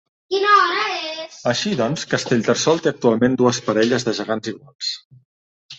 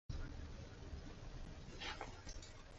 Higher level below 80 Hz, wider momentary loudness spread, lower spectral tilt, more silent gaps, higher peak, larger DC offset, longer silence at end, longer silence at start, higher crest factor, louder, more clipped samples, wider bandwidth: second, -60 dBFS vs -54 dBFS; first, 11 LU vs 7 LU; about the same, -4 dB/octave vs -4 dB/octave; first, 4.75-4.79 s, 5.05-5.10 s, 5.25-5.69 s vs none; first, -2 dBFS vs -34 dBFS; neither; about the same, 0.05 s vs 0 s; first, 0.3 s vs 0.1 s; about the same, 18 dB vs 18 dB; first, -19 LUFS vs -52 LUFS; neither; about the same, 8.2 kHz vs 8 kHz